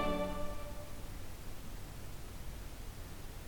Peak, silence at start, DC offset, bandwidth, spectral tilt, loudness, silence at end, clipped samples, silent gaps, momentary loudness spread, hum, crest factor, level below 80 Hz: -22 dBFS; 0 s; under 0.1%; 19 kHz; -5 dB/octave; -46 LUFS; 0 s; under 0.1%; none; 10 LU; none; 18 dB; -46 dBFS